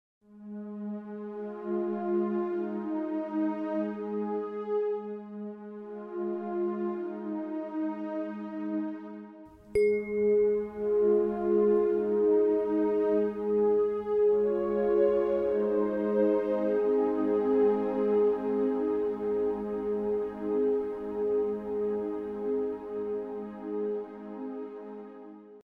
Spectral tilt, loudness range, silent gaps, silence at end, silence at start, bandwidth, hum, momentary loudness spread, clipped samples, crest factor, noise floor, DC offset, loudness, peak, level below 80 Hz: -9 dB/octave; 8 LU; none; 0 s; 0.3 s; 5.2 kHz; none; 14 LU; under 0.1%; 14 dB; -50 dBFS; under 0.1%; -29 LUFS; -14 dBFS; -62 dBFS